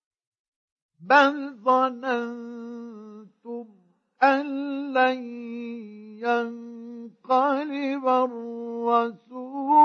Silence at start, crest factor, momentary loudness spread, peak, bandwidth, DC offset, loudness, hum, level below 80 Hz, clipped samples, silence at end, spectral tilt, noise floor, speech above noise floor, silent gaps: 1 s; 22 dB; 18 LU; -4 dBFS; 7.2 kHz; under 0.1%; -24 LUFS; none; -82 dBFS; under 0.1%; 0 s; -5 dB/octave; -45 dBFS; 20 dB; none